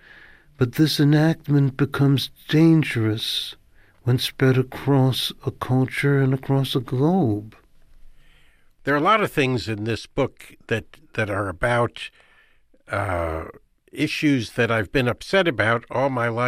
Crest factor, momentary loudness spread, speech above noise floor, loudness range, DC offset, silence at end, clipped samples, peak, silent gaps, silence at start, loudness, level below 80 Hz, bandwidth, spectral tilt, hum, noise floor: 16 dB; 10 LU; 35 dB; 6 LU; under 0.1%; 0 s; under 0.1%; -6 dBFS; none; 0.6 s; -22 LUFS; -48 dBFS; 15.5 kHz; -6.5 dB/octave; none; -56 dBFS